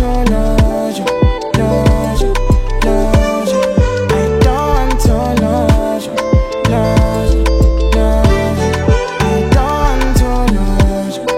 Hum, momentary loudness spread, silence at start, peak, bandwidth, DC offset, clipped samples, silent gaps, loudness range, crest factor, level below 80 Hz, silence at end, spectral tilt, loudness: none; 3 LU; 0 s; 0 dBFS; 15.5 kHz; under 0.1%; under 0.1%; none; 1 LU; 12 dB; -14 dBFS; 0 s; -6.5 dB/octave; -13 LUFS